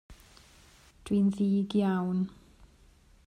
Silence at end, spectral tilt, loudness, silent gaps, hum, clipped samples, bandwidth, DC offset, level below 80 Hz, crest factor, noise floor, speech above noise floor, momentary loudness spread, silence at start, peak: 0.95 s; -8 dB/octave; -29 LUFS; none; none; under 0.1%; 10 kHz; under 0.1%; -60 dBFS; 16 dB; -60 dBFS; 32 dB; 9 LU; 0.1 s; -16 dBFS